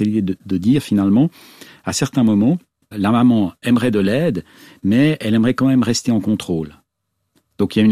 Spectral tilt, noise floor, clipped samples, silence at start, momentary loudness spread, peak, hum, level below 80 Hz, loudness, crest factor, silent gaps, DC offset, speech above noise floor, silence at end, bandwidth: -6 dB/octave; -73 dBFS; under 0.1%; 0 s; 9 LU; -4 dBFS; none; -50 dBFS; -17 LUFS; 14 dB; none; under 0.1%; 57 dB; 0 s; 14.5 kHz